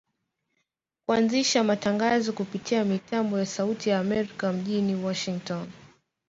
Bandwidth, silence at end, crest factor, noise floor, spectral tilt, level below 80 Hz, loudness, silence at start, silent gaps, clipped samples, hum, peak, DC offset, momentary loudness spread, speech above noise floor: 7.8 kHz; 0.45 s; 18 dB; -79 dBFS; -4.5 dB/octave; -66 dBFS; -26 LUFS; 1.1 s; none; under 0.1%; none; -10 dBFS; under 0.1%; 10 LU; 53 dB